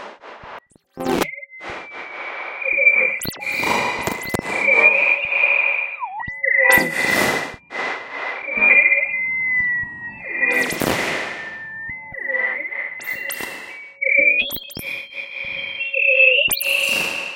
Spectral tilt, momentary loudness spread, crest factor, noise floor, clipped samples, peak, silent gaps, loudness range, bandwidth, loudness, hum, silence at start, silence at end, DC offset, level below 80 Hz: -2 dB/octave; 17 LU; 20 dB; -41 dBFS; under 0.1%; 0 dBFS; none; 6 LU; 17 kHz; -17 LUFS; none; 0 s; 0 s; under 0.1%; -52 dBFS